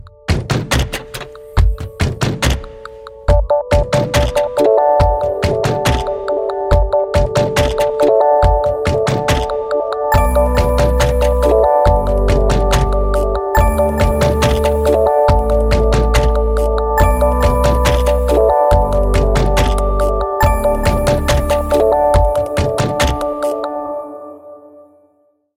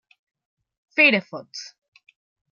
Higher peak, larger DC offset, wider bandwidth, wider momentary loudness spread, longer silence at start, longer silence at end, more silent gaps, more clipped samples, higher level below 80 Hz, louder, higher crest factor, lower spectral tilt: about the same, -2 dBFS vs -4 dBFS; neither; first, 16 kHz vs 14 kHz; second, 7 LU vs 21 LU; second, 0.05 s vs 0.95 s; first, 1 s vs 0.85 s; neither; neither; first, -18 dBFS vs -82 dBFS; first, -14 LUFS vs -18 LUFS; second, 12 dB vs 22 dB; first, -6 dB/octave vs -4 dB/octave